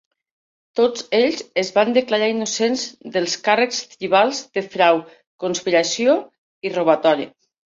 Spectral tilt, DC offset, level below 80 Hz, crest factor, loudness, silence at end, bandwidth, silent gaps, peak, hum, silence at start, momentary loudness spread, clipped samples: -3 dB/octave; under 0.1%; -68 dBFS; 18 dB; -19 LUFS; 0.5 s; 7.8 kHz; 5.27-5.38 s, 6.38-6.61 s; -2 dBFS; none; 0.75 s; 9 LU; under 0.1%